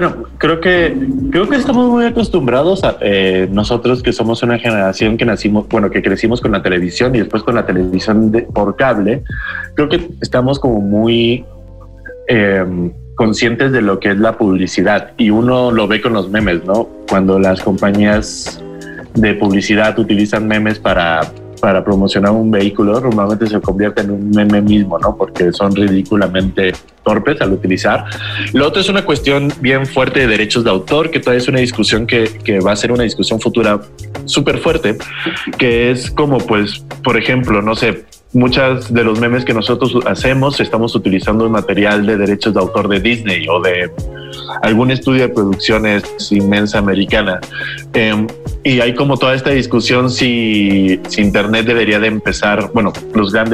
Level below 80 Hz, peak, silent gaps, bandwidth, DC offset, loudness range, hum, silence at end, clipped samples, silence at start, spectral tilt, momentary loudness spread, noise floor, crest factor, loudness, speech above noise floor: -34 dBFS; -2 dBFS; none; 12.5 kHz; under 0.1%; 2 LU; none; 0 s; under 0.1%; 0 s; -6 dB/octave; 6 LU; -33 dBFS; 10 dB; -13 LUFS; 21 dB